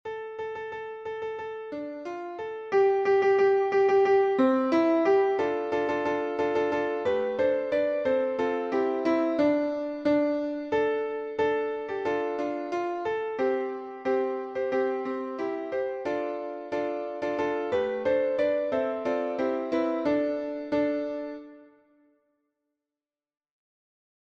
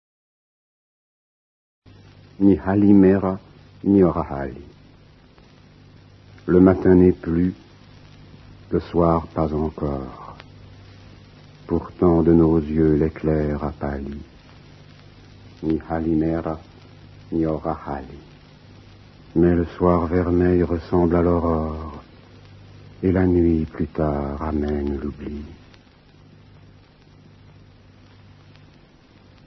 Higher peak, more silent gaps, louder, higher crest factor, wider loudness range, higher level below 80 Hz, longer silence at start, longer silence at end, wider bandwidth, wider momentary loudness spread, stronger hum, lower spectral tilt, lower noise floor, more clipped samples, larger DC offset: second, -12 dBFS vs -2 dBFS; neither; second, -27 LUFS vs -20 LUFS; about the same, 16 dB vs 20 dB; about the same, 7 LU vs 8 LU; second, -66 dBFS vs -40 dBFS; second, 0.05 s vs 2.4 s; second, 2.75 s vs 3.9 s; first, 7.2 kHz vs 6 kHz; second, 13 LU vs 18 LU; neither; second, -6 dB/octave vs -10.5 dB/octave; first, under -90 dBFS vs -51 dBFS; neither; neither